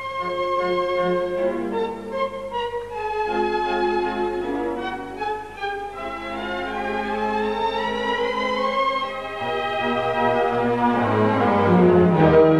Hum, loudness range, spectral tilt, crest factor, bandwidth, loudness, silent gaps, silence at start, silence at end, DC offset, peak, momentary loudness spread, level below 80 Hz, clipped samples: none; 6 LU; -7 dB/octave; 18 dB; 11.5 kHz; -22 LUFS; none; 0 s; 0 s; 0.3%; -2 dBFS; 12 LU; -48 dBFS; under 0.1%